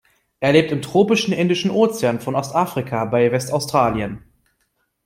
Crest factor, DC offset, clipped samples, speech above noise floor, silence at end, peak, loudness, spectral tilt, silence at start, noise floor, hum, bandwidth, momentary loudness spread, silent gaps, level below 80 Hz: 18 dB; under 0.1%; under 0.1%; 51 dB; 0.9 s; -2 dBFS; -19 LUFS; -5.5 dB/octave; 0.4 s; -69 dBFS; none; 16.5 kHz; 7 LU; none; -52 dBFS